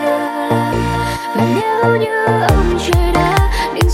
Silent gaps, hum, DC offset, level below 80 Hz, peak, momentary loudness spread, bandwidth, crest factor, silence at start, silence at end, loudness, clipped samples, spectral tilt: none; none; under 0.1%; -22 dBFS; 0 dBFS; 4 LU; 16.5 kHz; 14 dB; 0 s; 0 s; -15 LUFS; under 0.1%; -6 dB/octave